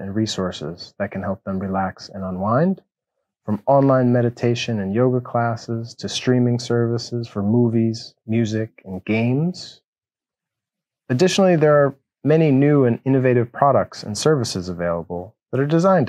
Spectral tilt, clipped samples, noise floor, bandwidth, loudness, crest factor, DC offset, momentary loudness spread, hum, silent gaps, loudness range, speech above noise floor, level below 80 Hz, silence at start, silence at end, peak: -6.5 dB/octave; under 0.1%; under -90 dBFS; 12 kHz; -20 LUFS; 18 dB; under 0.1%; 13 LU; none; 9.87-9.93 s; 7 LU; over 71 dB; -60 dBFS; 0 s; 0 s; -2 dBFS